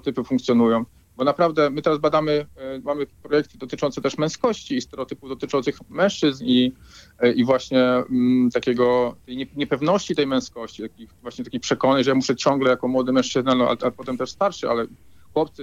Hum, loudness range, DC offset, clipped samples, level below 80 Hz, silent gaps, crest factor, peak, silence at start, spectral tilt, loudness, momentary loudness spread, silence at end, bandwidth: none; 4 LU; under 0.1%; under 0.1%; -56 dBFS; none; 18 dB; -4 dBFS; 0.05 s; -5.5 dB/octave; -22 LUFS; 13 LU; 0 s; 7.8 kHz